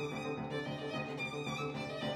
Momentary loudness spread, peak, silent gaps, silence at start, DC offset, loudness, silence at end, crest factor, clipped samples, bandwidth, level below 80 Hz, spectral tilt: 1 LU; -26 dBFS; none; 0 s; under 0.1%; -39 LUFS; 0 s; 14 dB; under 0.1%; 15 kHz; -66 dBFS; -5.5 dB/octave